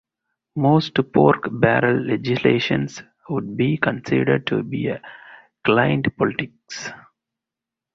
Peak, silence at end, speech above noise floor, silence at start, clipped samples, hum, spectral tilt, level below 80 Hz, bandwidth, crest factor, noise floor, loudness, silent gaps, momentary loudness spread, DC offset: -2 dBFS; 0.95 s; 67 dB; 0.55 s; under 0.1%; none; -6.5 dB/octave; -54 dBFS; 7.6 kHz; 18 dB; -87 dBFS; -20 LUFS; none; 15 LU; under 0.1%